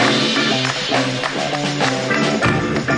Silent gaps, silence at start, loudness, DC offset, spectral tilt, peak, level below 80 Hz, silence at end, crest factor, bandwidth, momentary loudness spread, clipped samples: none; 0 s; -17 LUFS; under 0.1%; -4 dB/octave; -2 dBFS; -46 dBFS; 0 s; 16 dB; 11.5 kHz; 5 LU; under 0.1%